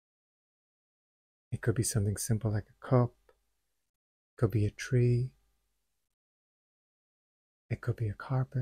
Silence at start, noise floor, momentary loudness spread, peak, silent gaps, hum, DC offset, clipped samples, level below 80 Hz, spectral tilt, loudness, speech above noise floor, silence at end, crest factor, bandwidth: 1.5 s; -82 dBFS; 9 LU; -14 dBFS; 3.89-4.37 s, 6.14-7.69 s; none; under 0.1%; under 0.1%; -56 dBFS; -6.5 dB/octave; -32 LUFS; 52 dB; 0 s; 20 dB; 15.5 kHz